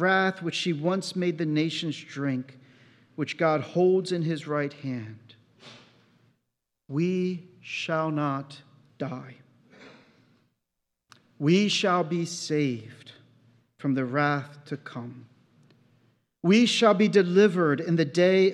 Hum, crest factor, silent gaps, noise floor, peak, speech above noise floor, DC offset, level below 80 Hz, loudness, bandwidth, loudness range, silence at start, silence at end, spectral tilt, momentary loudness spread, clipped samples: none; 20 dB; none; -82 dBFS; -6 dBFS; 57 dB; under 0.1%; -84 dBFS; -26 LUFS; 11.5 kHz; 10 LU; 0 s; 0 s; -5.5 dB/octave; 17 LU; under 0.1%